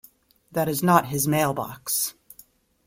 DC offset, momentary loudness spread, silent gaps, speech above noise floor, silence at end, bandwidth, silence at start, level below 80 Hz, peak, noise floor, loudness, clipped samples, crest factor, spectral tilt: under 0.1%; 10 LU; none; 32 dB; 0.75 s; 16.5 kHz; 0.5 s; -60 dBFS; -2 dBFS; -55 dBFS; -23 LUFS; under 0.1%; 22 dB; -4.5 dB/octave